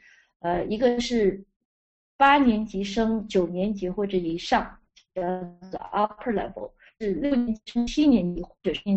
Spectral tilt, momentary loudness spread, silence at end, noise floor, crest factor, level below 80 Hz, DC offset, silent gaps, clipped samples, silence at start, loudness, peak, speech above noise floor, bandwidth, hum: -6 dB/octave; 14 LU; 0 s; under -90 dBFS; 20 dB; -48 dBFS; under 0.1%; 1.56-2.19 s; under 0.1%; 0.45 s; -25 LUFS; -6 dBFS; over 66 dB; 8.2 kHz; none